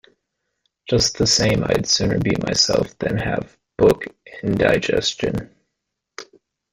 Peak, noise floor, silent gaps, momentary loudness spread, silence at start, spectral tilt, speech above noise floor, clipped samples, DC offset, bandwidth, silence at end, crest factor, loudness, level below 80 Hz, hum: -2 dBFS; -79 dBFS; none; 13 LU; 0.85 s; -4 dB/octave; 60 dB; under 0.1%; under 0.1%; 16 kHz; 0.5 s; 18 dB; -19 LUFS; -42 dBFS; none